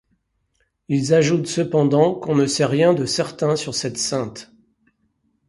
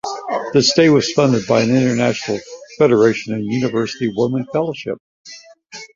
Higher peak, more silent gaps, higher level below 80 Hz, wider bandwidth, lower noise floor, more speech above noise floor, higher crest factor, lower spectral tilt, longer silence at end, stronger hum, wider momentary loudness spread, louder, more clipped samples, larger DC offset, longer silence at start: about the same, -2 dBFS vs -2 dBFS; second, none vs 5.00-5.25 s; about the same, -58 dBFS vs -56 dBFS; first, 11.5 kHz vs 7.6 kHz; first, -68 dBFS vs -40 dBFS; first, 50 dB vs 24 dB; about the same, 18 dB vs 16 dB; about the same, -5 dB/octave vs -5 dB/octave; first, 1.05 s vs 0.1 s; neither; second, 8 LU vs 17 LU; second, -19 LUFS vs -16 LUFS; neither; neither; first, 0.9 s vs 0.05 s